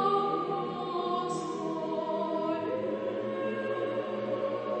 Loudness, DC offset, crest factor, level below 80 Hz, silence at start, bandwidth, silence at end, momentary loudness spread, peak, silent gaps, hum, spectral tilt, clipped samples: -32 LUFS; under 0.1%; 16 dB; -74 dBFS; 0 s; 8.4 kHz; 0 s; 3 LU; -16 dBFS; none; none; -6 dB/octave; under 0.1%